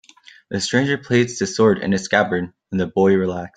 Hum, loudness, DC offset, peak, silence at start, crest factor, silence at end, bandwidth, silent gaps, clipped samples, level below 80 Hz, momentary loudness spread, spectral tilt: none; -19 LUFS; under 0.1%; -2 dBFS; 0.5 s; 18 dB; 0.1 s; 9.4 kHz; none; under 0.1%; -56 dBFS; 8 LU; -5 dB/octave